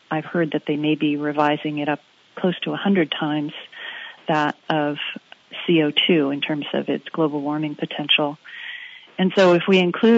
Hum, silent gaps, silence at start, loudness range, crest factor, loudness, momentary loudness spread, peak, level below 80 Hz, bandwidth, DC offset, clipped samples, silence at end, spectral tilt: none; none; 0.1 s; 3 LU; 16 dB; -21 LUFS; 16 LU; -4 dBFS; -76 dBFS; 7.8 kHz; under 0.1%; under 0.1%; 0 s; -6.5 dB/octave